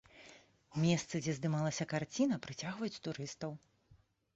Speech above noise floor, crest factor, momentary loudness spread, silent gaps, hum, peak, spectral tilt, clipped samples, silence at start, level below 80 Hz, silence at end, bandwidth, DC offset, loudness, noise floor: 32 dB; 20 dB; 17 LU; none; none; -20 dBFS; -6 dB/octave; under 0.1%; 0.15 s; -72 dBFS; 0.4 s; 8 kHz; under 0.1%; -38 LUFS; -68 dBFS